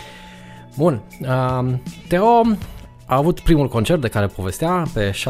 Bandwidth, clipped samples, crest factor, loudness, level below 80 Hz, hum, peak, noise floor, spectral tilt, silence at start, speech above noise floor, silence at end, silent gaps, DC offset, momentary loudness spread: 16 kHz; under 0.1%; 16 dB; -19 LUFS; -32 dBFS; none; -2 dBFS; -39 dBFS; -6.5 dB/octave; 0 s; 22 dB; 0 s; none; under 0.1%; 15 LU